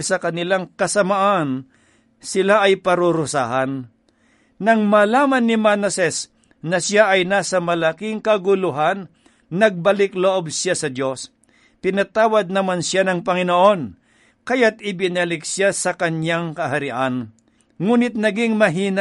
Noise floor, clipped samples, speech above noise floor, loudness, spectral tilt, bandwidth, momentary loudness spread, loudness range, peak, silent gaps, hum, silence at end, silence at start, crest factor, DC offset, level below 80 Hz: -59 dBFS; under 0.1%; 40 dB; -18 LUFS; -4.5 dB/octave; 11.5 kHz; 10 LU; 3 LU; -2 dBFS; none; none; 0 s; 0 s; 18 dB; under 0.1%; -62 dBFS